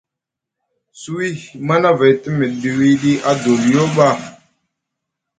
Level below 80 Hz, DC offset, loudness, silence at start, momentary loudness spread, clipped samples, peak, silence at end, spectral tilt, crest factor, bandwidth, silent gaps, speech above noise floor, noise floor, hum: -56 dBFS; under 0.1%; -15 LUFS; 0.95 s; 12 LU; under 0.1%; 0 dBFS; 1.1 s; -6 dB/octave; 16 dB; 9.4 kHz; none; 68 dB; -83 dBFS; none